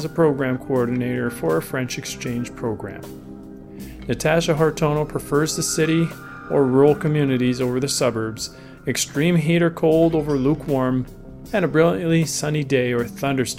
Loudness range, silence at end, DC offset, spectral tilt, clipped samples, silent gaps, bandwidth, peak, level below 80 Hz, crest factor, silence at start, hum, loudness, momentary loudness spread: 6 LU; 0 s; under 0.1%; -5.5 dB/octave; under 0.1%; none; 16.5 kHz; -4 dBFS; -46 dBFS; 18 dB; 0 s; none; -21 LUFS; 14 LU